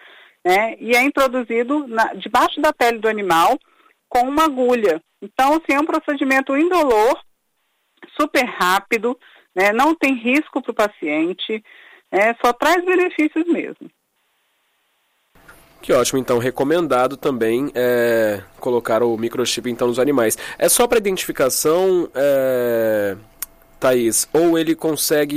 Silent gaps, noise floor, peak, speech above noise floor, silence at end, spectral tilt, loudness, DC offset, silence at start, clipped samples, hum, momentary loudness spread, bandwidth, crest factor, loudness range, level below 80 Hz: none; -68 dBFS; -4 dBFS; 51 dB; 0 s; -3.5 dB/octave; -18 LUFS; under 0.1%; 0.45 s; under 0.1%; none; 8 LU; 16 kHz; 14 dB; 3 LU; -52 dBFS